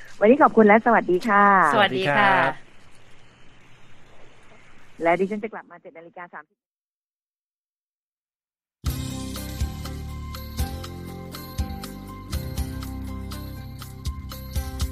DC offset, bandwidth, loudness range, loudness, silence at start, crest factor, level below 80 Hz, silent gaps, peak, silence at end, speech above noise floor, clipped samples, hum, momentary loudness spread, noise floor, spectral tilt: under 0.1%; 15.5 kHz; 16 LU; -21 LUFS; 0 s; 22 dB; -38 dBFS; 6.71-6.75 s, 6.81-7.14 s, 7.23-7.34 s, 7.41-7.69 s, 7.77-8.27 s, 8.35-8.40 s; -2 dBFS; 0 s; over 71 dB; under 0.1%; none; 22 LU; under -90 dBFS; -5.5 dB/octave